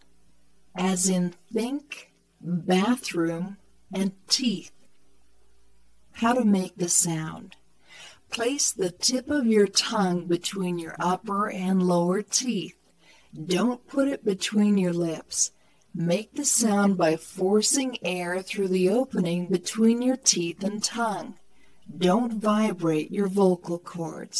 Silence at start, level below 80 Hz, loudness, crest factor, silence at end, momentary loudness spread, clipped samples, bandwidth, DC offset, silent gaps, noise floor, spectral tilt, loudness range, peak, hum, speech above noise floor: 0.75 s; -68 dBFS; -25 LUFS; 20 dB; 0 s; 11 LU; under 0.1%; 11 kHz; under 0.1%; none; -65 dBFS; -4 dB/octave; 4 LU; -6 dBFS; none; 40 dB